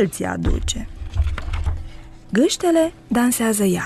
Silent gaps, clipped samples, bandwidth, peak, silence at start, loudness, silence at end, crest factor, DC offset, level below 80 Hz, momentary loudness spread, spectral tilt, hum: none; under 0.1%; 13.5 kHz; -6 dBFS; 0 s; -21 LUFS; 0 s; 14 dB; under 0.1%; -28 dBFS; 11 LU; -5 dB/octave; none